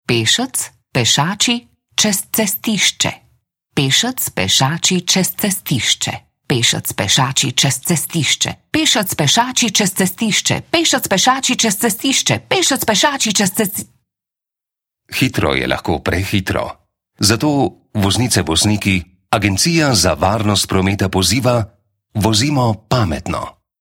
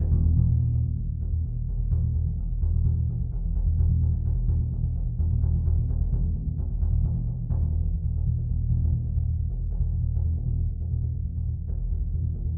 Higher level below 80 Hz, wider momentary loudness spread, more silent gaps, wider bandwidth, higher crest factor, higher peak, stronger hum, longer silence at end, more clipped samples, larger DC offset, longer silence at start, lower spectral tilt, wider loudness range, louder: second, -42 dBFS vs -28 dBFS; about the same, 7 LU vs 6 LU; neither; first, 17.5 kHz vs 1.2 kHz; about the same, 16 dB vs 14 dB; first, 0 dBFS vs -10 dBFS; neither; first, 0.3 s vs 0 s; neither; neither; about the same, 0.1 s vs 0 s; second, -3 dB/octave vs -16.5 dB/octave; about the same, 4 LU vs 2 LU; first, -15 LUFS vs -27 LUFS